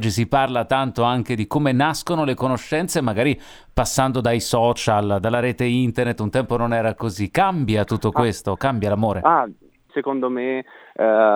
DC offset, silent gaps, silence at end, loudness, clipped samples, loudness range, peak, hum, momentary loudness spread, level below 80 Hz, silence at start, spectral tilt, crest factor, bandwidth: under 0.1%; none; 0 s; -21 LUFS; under 0.1%; 1 LU; 0 dBFS; none; 6 LU; -44 dBFS; 0 s; -5.5 dB/octave; 20 dB; 19 kHz